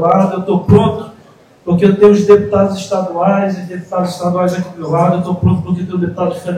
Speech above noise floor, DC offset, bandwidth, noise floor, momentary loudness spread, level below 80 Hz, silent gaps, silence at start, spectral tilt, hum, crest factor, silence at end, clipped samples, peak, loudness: 31 dB; under 0.1%; 12 kHz; -43 dBFS; 10 LU; -42 dBFS; none; 0 s; -8 dB/octave; none; 12 dB; 0 s; 0.4%; 0 dBFS; -13 LUFS